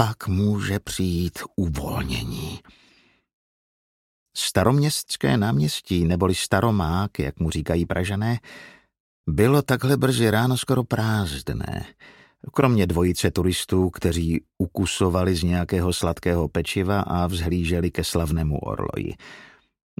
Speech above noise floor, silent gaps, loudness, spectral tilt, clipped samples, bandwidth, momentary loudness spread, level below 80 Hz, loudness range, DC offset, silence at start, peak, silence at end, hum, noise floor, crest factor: 37 dB; 3.33-4.26 s, 9.00-9.24 s; -23 LUFS; -5.5 dB/octave; under 0.1%; 16.5 kHz; 10 LU; -38 dBFS; 5 LU; under 0.1%; 0 s; -2 dBFS; 0.55 s; none; -59 dBFS; 22 dB